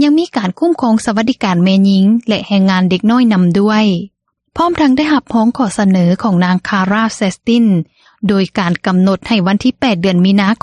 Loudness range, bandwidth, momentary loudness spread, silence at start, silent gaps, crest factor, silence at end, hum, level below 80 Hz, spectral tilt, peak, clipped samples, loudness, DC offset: 2 LU; 11 kHz; 5 LU; 0 s; none; 12 dB; 0.05 s; none; -48 dBFS; -6.5 dB/octave; 0 dBFS; under 0.1%; -12 LUFS; under 0.1%